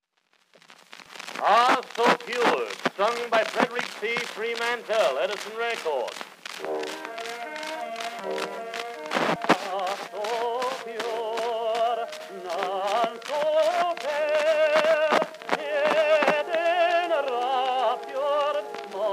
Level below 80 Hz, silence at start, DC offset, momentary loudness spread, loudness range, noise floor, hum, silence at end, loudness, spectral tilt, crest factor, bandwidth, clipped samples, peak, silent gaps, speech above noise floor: -86 dBFS; 0.7 s; under 0.1%; 12 LU; 6 LU; -68 dBFS; none; 0 s; -25 LUFS; -3 dB/octave; 22 dB; 15.5 kHz; under 0.1%; -4 dBFS; none; 41 dB